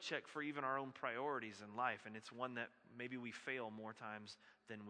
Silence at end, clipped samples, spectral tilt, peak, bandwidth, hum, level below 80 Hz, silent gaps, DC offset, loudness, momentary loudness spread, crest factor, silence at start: 0 s; under 0.1%; -4.5 dB/octave; -26 dBFS; 10 kHz; none; under -90 dBFS; none; under 0.1%; -47 LUFS; 10 LU; 22 dB; 0 s